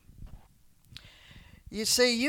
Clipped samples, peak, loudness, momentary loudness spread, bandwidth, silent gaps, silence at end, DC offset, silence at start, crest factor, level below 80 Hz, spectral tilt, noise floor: under 0.1%; -12 dBFS; -27 LUFS; 28 LU; 19 kHz; none; 0 s; under 0.1%; 0.2 s; 20 dB; -54 dBFS; -1.5 dB/octave; -60 dBFS